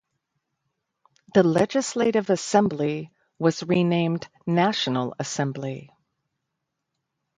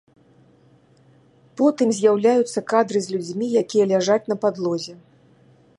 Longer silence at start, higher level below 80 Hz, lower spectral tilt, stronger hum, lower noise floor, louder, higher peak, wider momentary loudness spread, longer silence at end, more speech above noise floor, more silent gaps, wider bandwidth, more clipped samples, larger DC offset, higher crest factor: second, 1.35 s vs 1.55 s; first, -64 dBFS vs -72 dBFS; about the same, -5.5 dB/octave vs -5 dB/octave; neither; first, -81 dBFS vs -55 dBFS; second, -24 LUFS vs -20 LUFS; about the same, -4 dBFS vs -4 dBFS; first, 11 LU vs 8 LU; first, 1.5 s vs 0.85 s; first, 58 dB vs 35 dB; neither; second, 10 kHz vs 11.5 kHz; neither; neither; about the same, 20 dB vs 18 dB